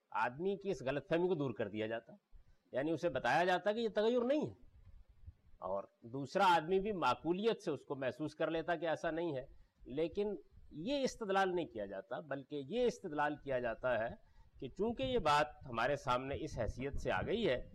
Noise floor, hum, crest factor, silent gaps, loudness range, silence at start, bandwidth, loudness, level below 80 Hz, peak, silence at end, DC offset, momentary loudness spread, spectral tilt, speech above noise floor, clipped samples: -60 dBFS; none; 14 dB; none; 3 LU; 0.1 s; 13 kHz; -38 LUFS; -58 dBFS; -24 dBFS; 0 s; under 0.1%; 11 LU; -5.5 dB/octave; 23 dB; under 0.1%